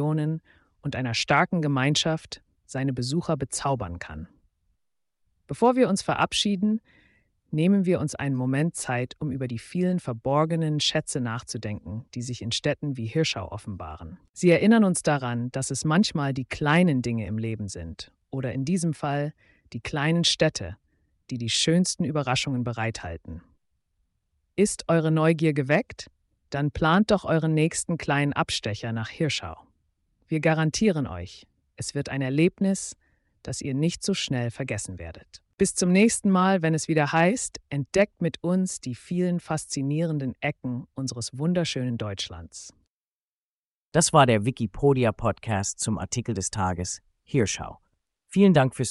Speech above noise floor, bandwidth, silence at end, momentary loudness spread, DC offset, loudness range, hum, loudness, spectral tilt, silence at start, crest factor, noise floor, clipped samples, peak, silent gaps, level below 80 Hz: over 65 dB; 11.5 kHz; 0 s; 15 LU; under 0.1%; 5 LU; none; -25 LUFS; -5 dB/octave; 0 s; 20 dB; under -90 dBFS; under 0.1%; -6 dBFS; 14.29-14.34 s, 42.89-43.92 s; -52 dBFS